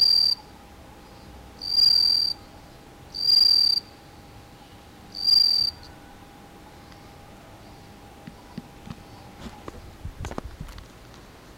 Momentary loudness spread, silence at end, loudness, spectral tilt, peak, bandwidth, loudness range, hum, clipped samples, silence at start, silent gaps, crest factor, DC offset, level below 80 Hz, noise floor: 27 LU; 0.75 s; -18 LUFS; -2 dB/octave; -10 dBFS; 16 kHz; 21 LU; none; under 0.1%; 0 s; none; 16 dB; under 0.1%; -50 dBFS; -47 dBFS